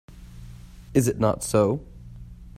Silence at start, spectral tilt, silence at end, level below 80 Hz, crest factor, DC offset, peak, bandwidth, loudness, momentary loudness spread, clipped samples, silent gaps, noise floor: 0.1 s; -6.5 dB/octave; 0 s; -44 dBFS; 20 dB; under 0.1%; -6 dBFS; 16 kHz; -24 LUFS; 23 LU; under 0.1%; none; -43 dBFS